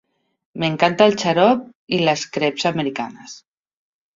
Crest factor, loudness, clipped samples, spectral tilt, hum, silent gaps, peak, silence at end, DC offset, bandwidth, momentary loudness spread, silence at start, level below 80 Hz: 20 dB; -19 LUFS; under 0.1%; -5 dB/octave; none; 1.75-1.87 s; 0 dBFS; 0.75 s; under 0.1%; 7.6 kHz; 16 LU; 0.55 s; -60 dBFS